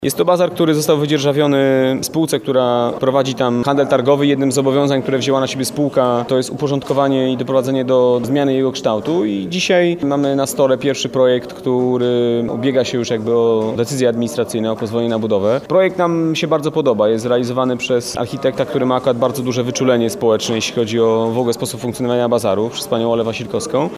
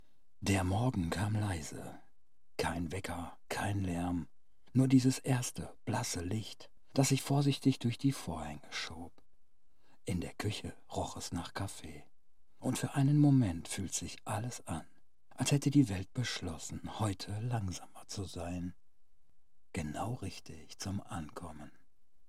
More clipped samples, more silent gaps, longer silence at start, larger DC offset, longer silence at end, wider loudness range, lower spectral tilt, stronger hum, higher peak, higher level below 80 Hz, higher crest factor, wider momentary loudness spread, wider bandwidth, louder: neither; neither; second, 0 s vs 0.4 s; second, under 0.1% vs 0.3%; second, 0 s vs 0.6 s; second, 2 LU vs 9 LU; about the same, -5.5 dB/octave vs -5.5 dB/octave; neither; first, 0 dBFS vs -14 dBFS; first, -54 dBFS vs -60 dBFS; second, 14 dB vs 22 dB; second, 5 LU vs 16 LU; about the same, 15.5 kHz vs 15.5 kHz; first, -16 LUFS vs -35 LUFS